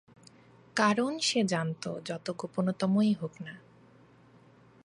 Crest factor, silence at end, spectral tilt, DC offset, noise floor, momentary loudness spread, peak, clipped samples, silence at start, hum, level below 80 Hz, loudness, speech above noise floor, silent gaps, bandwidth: 20 dB; 1.25 s; -5 dB/octave; under 0.1%; -59 dBFS; 13 LU; -12 dBFS; under 0.1%; 0.75 s; none; -76 dBFS; -30 LUFS; 29 dB; none; 11.5 kHz